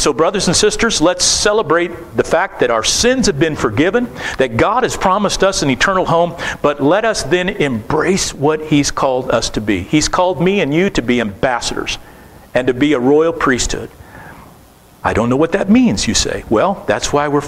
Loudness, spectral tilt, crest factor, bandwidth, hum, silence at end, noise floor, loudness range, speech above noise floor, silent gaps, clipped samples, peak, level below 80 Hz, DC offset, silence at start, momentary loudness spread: -14 LUFS; -4 dB/octave; 14 dB; 16 kHz; none; 0 s; -43 dBFS; 3 LU; 29 dB; none; under 0.1%; 0 dBFS; -34 dBFS; under 0.1%; 0 s; 6 LU